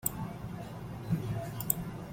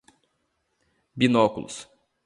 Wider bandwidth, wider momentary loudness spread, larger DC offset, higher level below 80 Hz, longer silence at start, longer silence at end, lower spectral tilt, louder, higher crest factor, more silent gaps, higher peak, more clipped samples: first, 16.5 kHz vs 11.5 kHz; second, 10 LU vs 20 LU; neither; first, -54 dBFS vs -62 dBFS; second, 0 s vs 1.15 s; second, 0 s vs 0.4 s; about the same, -5.5 dB/octave vs -5.5 dB/octave; second, -36 LUFS vs -22 LUFS; first, 28 dB vs 22 dB; neither; about the same, -8 dBFS vs -6 dBFS; neither